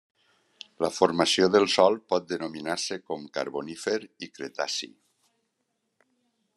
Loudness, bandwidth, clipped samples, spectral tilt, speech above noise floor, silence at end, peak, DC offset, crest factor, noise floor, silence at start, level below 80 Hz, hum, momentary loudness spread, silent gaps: -26 LUFS; 12.5 kHz; under 0.1%; -3.5 dB/octave; 52 dB; 1.7 s; -6 dBFS; under 0.1%; 22 dB; -78 dBFS; 0.8 s; -72 dBFS; none; 14 LU; none